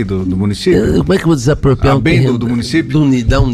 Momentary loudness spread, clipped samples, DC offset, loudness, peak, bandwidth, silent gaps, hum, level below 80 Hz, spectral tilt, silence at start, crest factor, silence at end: 4 LU; under 0.1%; under 0.1%; -12 LUFS; -2 dBFS; 13.5 kHz; none; none; -24 dBFS; -7 dB/octave; 0 s; 10 dB; 0 s